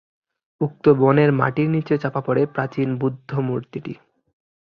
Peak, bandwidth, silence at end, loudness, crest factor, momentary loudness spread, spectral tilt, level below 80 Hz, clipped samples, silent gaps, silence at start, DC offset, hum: -2 dBFS; 5.8 kHz; 0.85 s; -20 LUFS; 20 dB; 14 LU; -10 dB/octave; -60 dBFS; under 0.1%; none; 0.6 s; under 0.1%; none